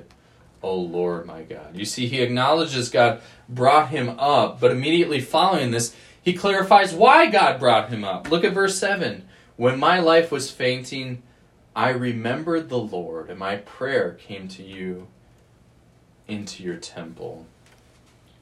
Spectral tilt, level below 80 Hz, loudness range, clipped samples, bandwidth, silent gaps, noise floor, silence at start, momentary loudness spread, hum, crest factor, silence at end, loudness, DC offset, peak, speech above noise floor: -4.5 dB/octave; -60 dBFS; 14 LU; under 0.1%; 13.5 kHz; none; -55 dBFS; 0.65 s; 19 LU; none; 22 dB; 0.95 s; -20 LUFS; under 0.1%; 0 dBFS; 34 dB